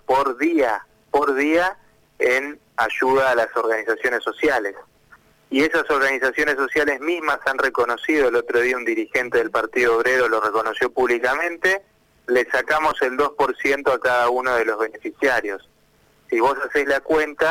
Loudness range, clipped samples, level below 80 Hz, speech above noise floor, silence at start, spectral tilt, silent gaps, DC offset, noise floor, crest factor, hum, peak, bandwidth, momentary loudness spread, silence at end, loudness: 2 LU; under 0.1%; -54 dBFS; 38 dB; 0.1 s; -3.5 dB/octave; none; under 0.1%; -58 dBFS; 16 dB; none; -6 dBFS; 17 kHz; 5 LU; 0 s; -20 LUFS